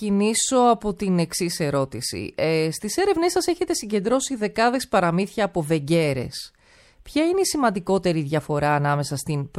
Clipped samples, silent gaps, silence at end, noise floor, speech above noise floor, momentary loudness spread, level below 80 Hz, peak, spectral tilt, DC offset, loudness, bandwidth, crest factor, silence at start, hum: under 0.1%; none; 0 s; -54 dBFS; 32 dB; 7 LU; -52 dBFS; -6 dBFS; -4.5 dB/octave; under 0.1%; -22 LUFS; 16 kHz; 16 dB; 0 s; none